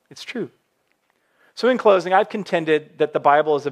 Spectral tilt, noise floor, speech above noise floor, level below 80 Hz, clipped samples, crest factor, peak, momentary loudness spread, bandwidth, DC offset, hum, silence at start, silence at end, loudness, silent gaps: -5.5 dB/octave; -67 dBFS; 48 dB; -80 dBFS; under 0.1%; 18 dB; -2 dBFS; 15 LU; 10.5 kHz; under 0.1%; none; 0.15 s; 0 s; -19 LUFS; none